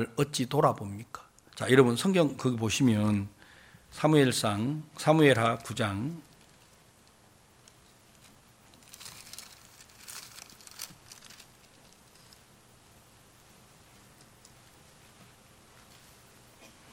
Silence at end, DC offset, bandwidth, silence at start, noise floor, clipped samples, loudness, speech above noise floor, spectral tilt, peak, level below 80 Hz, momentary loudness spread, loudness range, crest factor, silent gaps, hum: 5.8 s; under 0.1%; 16.5 kHz; 0 s; -60 dBFS; under 0.1%; -27 LUFS; 34 dB; -5.5 dB/octave; -8 dBFS; -66 dBFS; 25 LU; 23 LU; 24 dB; none; none